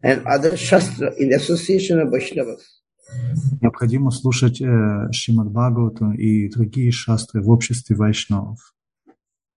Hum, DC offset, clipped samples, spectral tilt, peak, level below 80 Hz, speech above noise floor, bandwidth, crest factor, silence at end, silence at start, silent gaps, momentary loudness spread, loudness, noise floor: none; under 0.1%; under 0.1%; -6 dB/octave; 0 dBFS; -46 dBFS; 40 dB; 11 kHz; 18 dB; 1 s; 0.05 s; none; 8 LU; -19 LUFS; -58 dBFS